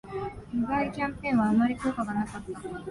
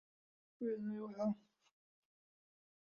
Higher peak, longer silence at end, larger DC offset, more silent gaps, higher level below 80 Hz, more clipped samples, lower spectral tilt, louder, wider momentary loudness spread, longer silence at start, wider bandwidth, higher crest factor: first, -14 dBFS vs -30 dBFS; second, 0 s vs 1.6 s; neither; neither; first, -52 dBFS vs -88 dBFS; neither; second, -7 dB/octave vs -8.5 dB/octave; first, -29 LUFS vs -43 LUFS; first, 13 LU vs 5 LU; second, 0.05 s vs 0.6 s; first, 11.5 kHz vs 6.8 kHz; about the same, 14 dB vs 16 dB